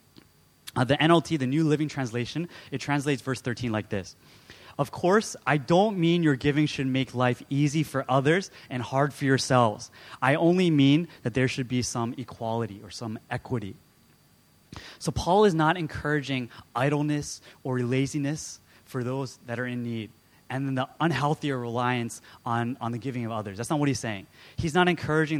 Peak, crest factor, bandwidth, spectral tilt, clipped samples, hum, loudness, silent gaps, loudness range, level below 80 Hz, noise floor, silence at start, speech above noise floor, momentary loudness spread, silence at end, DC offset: -6 dBFS; 22 dB; 15.5 kHz; -5.5 dB/octave; under 0.1%; none; -27 LUFS; none; 7 LU; -56 dBFS; -60 dBFS; 0.65 s; 34 dB; 14 LU; 0 s; under 0.1%